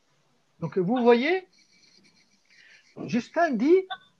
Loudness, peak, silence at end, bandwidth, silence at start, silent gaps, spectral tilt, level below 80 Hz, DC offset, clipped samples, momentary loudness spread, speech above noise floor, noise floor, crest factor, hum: -24 LUFS; -6 dBFS; 0.25 s; 7.2 kHz; 0.6 s; none; -6.5 dB/octave; -76 dBFS; under 0.1%; under 0.1%; 11 LU; 45 dB; -69 dBFS; 20 dB; none